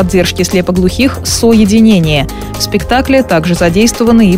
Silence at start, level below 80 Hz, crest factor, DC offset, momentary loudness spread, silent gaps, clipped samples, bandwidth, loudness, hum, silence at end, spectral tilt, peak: 0 s; -24 dBFS; 8 dB; under 0.1%; 7 LU; none; under 0.1%; 16.5 kHz; -9 LUFS; none; 0 s; -5 dB/octave; 0 dBFS